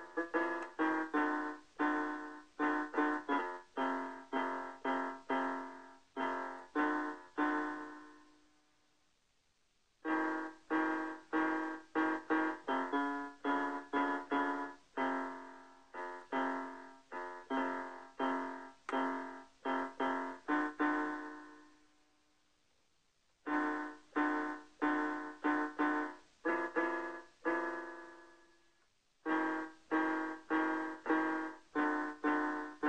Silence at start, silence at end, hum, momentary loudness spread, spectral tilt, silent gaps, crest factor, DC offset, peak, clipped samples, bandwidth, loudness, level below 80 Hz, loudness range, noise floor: 0 s; 0 s; none; 11 LU; -4.5 dB/octave; none; 18 dB; under 0.1%; -20 dBFS; under 0.1%; 9.2 kHz; -38 LUFS; -80 dBFS; 5 LU; -77 dBFS